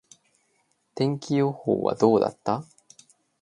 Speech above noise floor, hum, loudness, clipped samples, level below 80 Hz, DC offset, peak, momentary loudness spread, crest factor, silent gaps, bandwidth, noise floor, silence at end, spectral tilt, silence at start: 47 dB; none; -25 LUFS; under 0.1%; -66 dBFS; under 0.1%; -4 dBFS; 9 LU; 22 dB; none; 11 kHz; -70 dBFS; 0.8 s; -7 dB/octave; 0.95 s